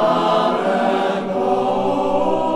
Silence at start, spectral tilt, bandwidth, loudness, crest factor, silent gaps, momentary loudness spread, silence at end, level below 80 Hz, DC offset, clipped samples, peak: 0 s; -6 dB/octave; 12.5 kHz; -18 LUFS; 12 dB; none; 3 LU; 0 s; -48 dBFS; under 0.1%; under 0.1%; -6 dBFS